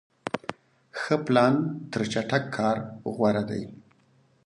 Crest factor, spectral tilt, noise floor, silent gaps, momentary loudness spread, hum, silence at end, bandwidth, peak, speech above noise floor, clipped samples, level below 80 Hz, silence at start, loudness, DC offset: 20 dB; -6.5 dB/octave; -63 dBFS; none; 14 LU; none; 0.7 s; 11 kHz; -6 dBFS; 37 dB; under 0.1%; -64 dBFS; 0.25 s; -27 LUFS; under 0.1%